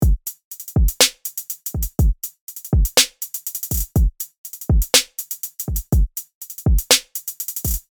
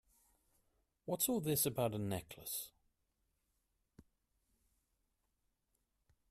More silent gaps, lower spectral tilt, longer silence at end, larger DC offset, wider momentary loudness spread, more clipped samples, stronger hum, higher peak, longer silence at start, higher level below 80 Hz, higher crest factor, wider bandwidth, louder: first, 0.44-0.51 s, 2.41-2.47 s, 4.38-4.44 s, 6.34-6.41 s vs none; second, -3 dB/octave vs -4.5 dB/octave; second, 0.1 s vs 2.3 s; neither; first, 15 LU vs 11 LU; neither; neither; first, 0 dBFS vs -20 dBFS; second, 0 s vs 1.05 s; first, -24 dBFS vs -72 dBFS; about the same, 20 dB vs 24 dB; first, over 20 kHz vs 15.5 kHz; first, -20 LUFS vs -38 LUFS